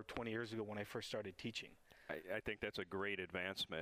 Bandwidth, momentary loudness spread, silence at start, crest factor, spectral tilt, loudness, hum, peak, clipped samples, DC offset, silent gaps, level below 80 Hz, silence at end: 15.5 kHz; 7 LU; 0 s; 20 dB; -4.5 dB/octave; -45 LUFS; none; -26 dBFS; under 0.1%; under 0.1%; none; -70 dBFS; 0 s